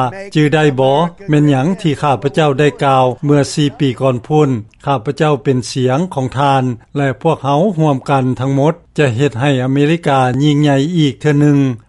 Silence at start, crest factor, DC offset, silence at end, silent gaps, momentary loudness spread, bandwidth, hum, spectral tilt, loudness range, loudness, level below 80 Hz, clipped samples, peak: 0 s; 12 dB; under 0.1%; 0.1 s; none; 5 LU; 11.5 kHz; none; -7 dB/octave; 2 LU; -14 LUFS; -48 dBFS; under 0.1%; 0 dBFS